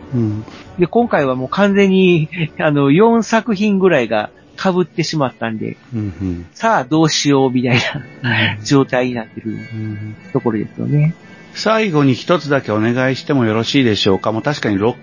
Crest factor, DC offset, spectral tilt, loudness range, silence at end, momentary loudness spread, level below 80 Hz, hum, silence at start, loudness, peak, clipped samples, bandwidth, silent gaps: 14 dB; 0.1%; -6 dB/octave; 5 LU; 0.05 s; 12 LU; -46 dBFS; none; 0 s; -16 LUFS; 0 dBFS; under 0.1%; 7.4 kHz; none